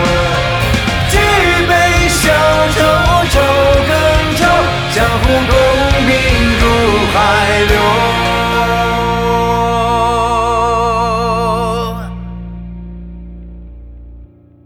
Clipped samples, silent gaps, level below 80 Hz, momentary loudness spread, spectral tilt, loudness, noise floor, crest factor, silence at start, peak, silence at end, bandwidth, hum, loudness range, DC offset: under 0.1%; none; -22 dBFS; 14 LU; -4.5 dB/octave; -11 LUFS; -38 dBFS; 12 dB; 0 s; 0 dBFS; 0.4 s; over 20 kHz; 60 Hz at -40 dBFS; 7 LU; under 0.1%